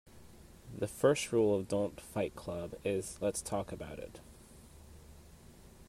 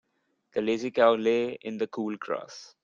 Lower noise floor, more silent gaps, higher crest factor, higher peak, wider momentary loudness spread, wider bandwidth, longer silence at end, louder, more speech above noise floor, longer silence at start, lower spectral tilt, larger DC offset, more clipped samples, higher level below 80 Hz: second, -56 dBFS vs -74 dBFS; neither; about the same, 20 dB vs 20 dB; second, -16 dBFS vs -8 dBFS; first, 26 LU vs 12 LU; first, 16 kHz vs 7.4 kHz; about the same, 0.05 s vs 0.15 s; second, -35 LUFS vs -28 LUFS; second, 22 dB vs 46 dB; second, 0.15 s vs 0.55 s; about the same, -5 dB/octave vs -5 dB/octave; neither; neither; first, -60 dBFS vs -76 dBFS